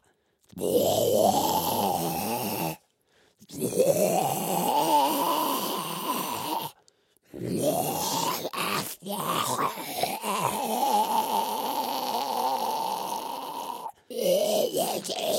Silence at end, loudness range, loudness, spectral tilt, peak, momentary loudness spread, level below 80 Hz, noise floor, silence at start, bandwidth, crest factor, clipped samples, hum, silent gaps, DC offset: 0 s; 3 LU; -27 LUFS; -3.5 dB/octave; -10 dBFS; 11 LU; -68 dBFS; -67 dBFS; 0.55 s; 16.5 kHz; 18 dB; under 0.1%; none; none; under 0.1%